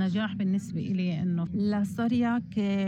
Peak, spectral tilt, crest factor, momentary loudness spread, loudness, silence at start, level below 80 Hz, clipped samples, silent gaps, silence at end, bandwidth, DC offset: -18 dBFS; -7.5 dB/octave; 10 dB; 3 LU; -29 LUFS; 0 s; -62 dBFS; under 0.1%; none; 0 s; 11 kHz; under 0.1%